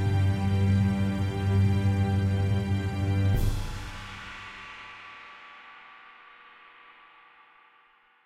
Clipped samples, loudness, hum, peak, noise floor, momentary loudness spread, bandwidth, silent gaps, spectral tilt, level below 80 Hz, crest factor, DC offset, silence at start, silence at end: under 0.1%; -27 LUFS; none; -14 dBFS; -62 dBFS; 22 LU; 13 kHz; none; -7.5 dB/octave; -40 dBFS; 14 dB; under 0.1%; 0 s; 2.3 s